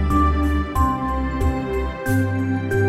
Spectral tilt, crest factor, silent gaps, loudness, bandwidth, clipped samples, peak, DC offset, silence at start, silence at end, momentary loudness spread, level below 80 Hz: -7.5 dB/octave; 14 dB; none; -21 LUFS; 15 kHz; under 0.1%; -6 dBFS; under 0.1%; 0 s; 0 s; 5 LU; -24 dBFS